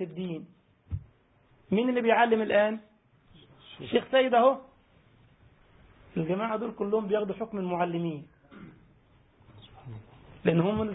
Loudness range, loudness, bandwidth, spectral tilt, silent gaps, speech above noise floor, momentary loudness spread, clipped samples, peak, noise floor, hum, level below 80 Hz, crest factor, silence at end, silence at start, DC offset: 7 LU; -27 LUFS; 4 kHz; -10.5 dB/octave; none; 37 dB; 20 LU; under 0.1%; -10 dBFS; -63 dBFS; none; -56 dBFS; 20 dB; 0 s; 0 s; under 0.1%